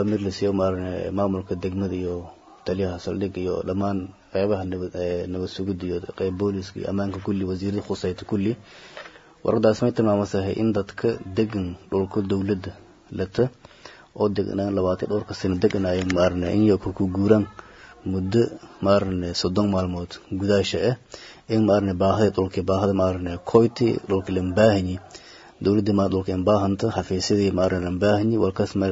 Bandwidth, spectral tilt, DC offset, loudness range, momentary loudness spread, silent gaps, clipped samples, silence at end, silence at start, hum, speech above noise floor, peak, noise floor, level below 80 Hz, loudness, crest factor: 7.8 kHz; -7 dB/octave; under 0.1%; 5 LU; 10 LU; none; under 0.1%; 0 s; 0 s; none; 24 dB; -2 dBFS; -46 dBFS; -54 dBFS; -24 LUFS; 20 dB